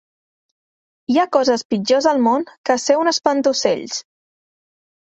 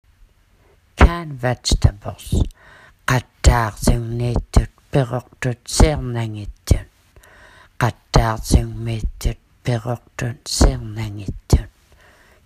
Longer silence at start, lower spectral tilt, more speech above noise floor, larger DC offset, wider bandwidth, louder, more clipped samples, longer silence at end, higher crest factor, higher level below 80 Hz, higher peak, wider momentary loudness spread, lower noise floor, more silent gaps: first, 1.1 s vs 0.95 s; second, -3.5 dB/octave vs -5 dB/octave; first, over 73 dB vs 36 dB; neither; second, 8.2 kHz vs 15.5 kHz; first, -17 LUFS vs -21 LUFS; neither; first, 1.05 s vs 0.75 s; about the same, 18 dB vs 20 dB; second, -64 dBFS vs -24 dBFS; about the same, -2 dBFS vs 0 dBFS; second, 7 LU vs 11 LU; first, under -90 dBFS vs -55 dBFS; first, 1.65-1.70 s, 2.58-2.64 s vs none